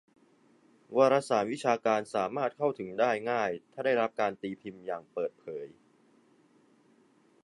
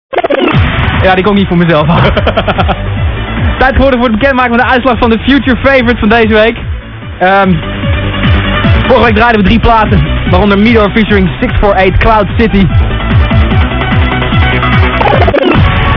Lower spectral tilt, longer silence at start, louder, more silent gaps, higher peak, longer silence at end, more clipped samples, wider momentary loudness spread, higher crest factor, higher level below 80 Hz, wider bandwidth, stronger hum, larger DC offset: second, -5 dB/octave vs -8.5 dB/octave; first, 0.9 s vs 0.1 s; second, -30 LUFS vs -8 LUFS; neither; second, -12 dBFS vs 0 dBFS; first, 1.75 s vs 0 s; second, under 0.1% vs 4%; first, 14 LU vs 6 LU; first, 20 dB vs 8 dB; second, -78 dBFS vs -16 dBFS; first, 11.5 kHz vs 5.4 kHz; neither; second, under 0.1% vs 0.3%